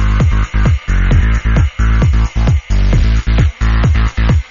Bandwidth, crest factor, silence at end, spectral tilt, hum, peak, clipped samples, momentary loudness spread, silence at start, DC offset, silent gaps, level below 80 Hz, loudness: 7.2 kHz; 10 dB; 0.1 s; -6.5 dB/octave; none; 0 dBFS; under 0.1%; 2 LU; 0 s; under 0.1%; none; -12 dBFS; -14 LUFS